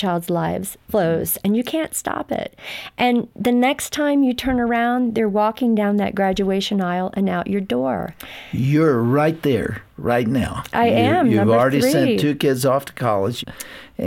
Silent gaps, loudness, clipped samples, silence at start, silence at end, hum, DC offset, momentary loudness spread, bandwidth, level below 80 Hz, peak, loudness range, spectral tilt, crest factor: none; -19 LUFS; under 0.1%; 0 s; 0 s; none; under 0.1%; 11 LU; 17 kHz; -46 dBFS; -6 dBFS; 3 LU; -5.5 dB/octave; 12 dB